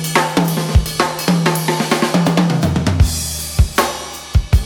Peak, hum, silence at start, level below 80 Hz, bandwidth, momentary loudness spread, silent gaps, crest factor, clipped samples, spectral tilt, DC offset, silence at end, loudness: 0 dBFS; none; 0 s; -22 dBFS; 18.5 kHz; 5 LU; none; 14 dB; under 0.1%; -5 dB/octave; under 0.1%; 0 s; -16 LUFS